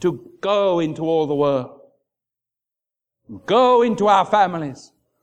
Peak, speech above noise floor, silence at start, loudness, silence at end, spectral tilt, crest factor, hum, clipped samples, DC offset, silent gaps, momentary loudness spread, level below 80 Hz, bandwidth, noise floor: -2 dBFS; 69 dB; 0 s; -18 LUFS; 0.45 s; -6 dB/octave; 18 dB; none; under 0.1%; under 0.1%; none; 13 LU; -64 dBFS; 9 kHz; -87 dBFS